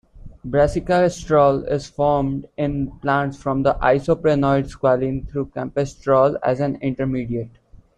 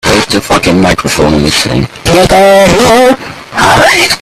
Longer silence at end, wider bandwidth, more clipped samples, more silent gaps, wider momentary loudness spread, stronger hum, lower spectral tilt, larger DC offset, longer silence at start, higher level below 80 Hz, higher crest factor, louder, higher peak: first, 0.5 s vs 0 s; second, 10.5 kHz vs 16.5 kHz; second, under 0.1% vs 0.7%; neither; first, 9 LU vs 6 LU; neither; first, -7.5 dB/octave vs -4 dB/octave; neither; about the same, 0.15 s vs 0.05 s; second, -40 dBFS vs -26 dBFS; first, 16 dB vs 6 dB; second, -20 LUFS vs -6 LUFS; second, -4 dBFS vs 0 dBFS